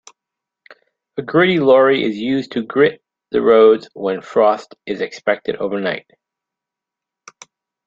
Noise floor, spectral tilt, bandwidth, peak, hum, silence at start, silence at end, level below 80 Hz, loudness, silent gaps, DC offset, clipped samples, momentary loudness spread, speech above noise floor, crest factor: -85 dBFS; -6 dB/octave; 7.6 kHz; -2 dBFS; none; 1.15 s; 1.9 s; -62 dBFS; -16 LUFS; none; under 0.1%; under 0.1%; 13 LU; 69 dB; 16 dB